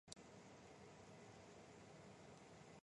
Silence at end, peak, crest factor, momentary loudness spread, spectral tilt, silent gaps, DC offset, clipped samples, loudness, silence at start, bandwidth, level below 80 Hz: 0 s; -32 dBFS; 32 dB; 2 LU; -4 dB/octave; none; under 0.1%; under 0.1%; -62 LUFS; 0.05 s; 11 kHz; -82 dBFS